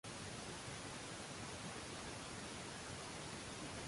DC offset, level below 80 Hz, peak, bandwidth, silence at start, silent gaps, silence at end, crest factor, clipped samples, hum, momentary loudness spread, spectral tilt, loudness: under 0.1%; -64 dBFS; -36 dBFS; 11.5 kHz; 0.05 s; none; 0 s; 14 dB; under 0.1%; none; 0 LU; -3 dB/octave; -48 LUFS